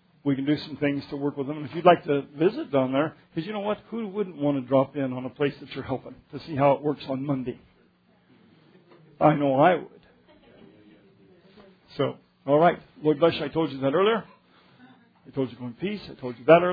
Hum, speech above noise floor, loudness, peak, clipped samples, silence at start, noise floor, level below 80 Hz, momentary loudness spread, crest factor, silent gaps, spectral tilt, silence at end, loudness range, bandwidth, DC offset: none; 37 dB; -25 LUFS; -4 dBFS; under 0.1%; 0.25 s; -62 dBFS; -64 dBFS; 14 LU; 22 dB; none; -9.5 dB/octave; 0 s; 4 LU; 5 kHz; under 0.1%